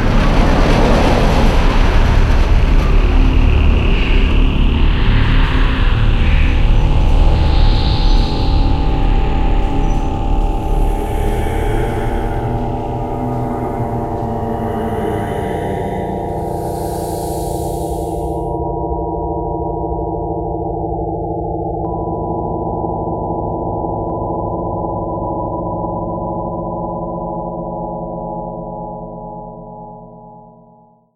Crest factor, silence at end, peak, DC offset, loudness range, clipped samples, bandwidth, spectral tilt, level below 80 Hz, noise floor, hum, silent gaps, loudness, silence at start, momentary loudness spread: 14 dB; 0.75 s; 0 dBFS; under 0.1%; 7 LU; under 0.1%; 12.5 kHz; -7 dB/octave; -16 dBFS; -47 dBFS; none; none; -18 LUFS; 0 s; 8 LU